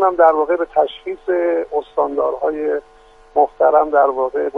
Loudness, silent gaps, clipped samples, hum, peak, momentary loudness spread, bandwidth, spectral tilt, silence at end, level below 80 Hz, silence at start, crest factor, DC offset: -17 LUFS; none; under 0.1%; none; 0 dBFS; 9 LU; 4.8 kHz; -6 dB/octave; 0 s; -52 dBFS; 0 s; 16 dB; under 0.1%